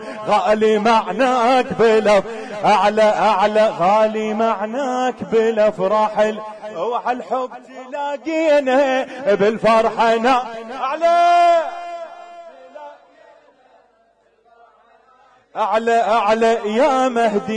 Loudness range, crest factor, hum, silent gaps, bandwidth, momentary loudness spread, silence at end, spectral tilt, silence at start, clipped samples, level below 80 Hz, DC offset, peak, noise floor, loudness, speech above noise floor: 6 LU; 12 dB; none; none; 10.5 kHz; 14 LU; 0 s; -5 dB/octave; 0 s; under 0.1%; -56 dBFS; under 0.1%; -6 dBFS; -58 dBFS; -17 LUFS; 42 dB